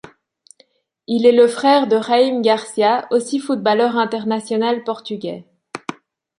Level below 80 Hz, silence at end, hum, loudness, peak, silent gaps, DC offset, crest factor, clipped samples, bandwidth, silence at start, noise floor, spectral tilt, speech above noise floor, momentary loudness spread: -68 dBFS; 0.5 s; none; -17 LUFS; -2 dBFS; none; under 0.1%; 16 dB; under 0.1%; 11.5 kHz; 1.1 s; -57 dBFS; -4.5 dB/octave; 41 dB; 17 LU